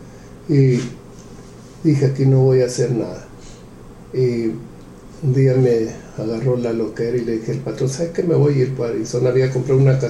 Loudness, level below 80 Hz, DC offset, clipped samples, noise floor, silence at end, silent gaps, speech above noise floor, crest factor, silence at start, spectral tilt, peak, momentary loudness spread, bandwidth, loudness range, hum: -18 LUFS; -46 dBFS; under 0.1%; under 0.1%; -39 dBFS; 0 s; none; 22 dB; 16 dB; 0 s; -8 dB/octave; -4 dBFS; 17 LU; 11 kHz; 3 LU; none